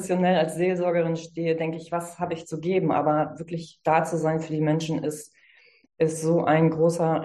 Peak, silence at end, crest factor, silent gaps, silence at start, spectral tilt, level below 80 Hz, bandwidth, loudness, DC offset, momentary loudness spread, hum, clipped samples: -6 dBFS; 0 s; 18 dB; none; 0 s; -6.5 dB/octave; -64 dBFS; 12.5 kHz; -25 LUFS; under 0.1%; 10 LU; none; under 0.1%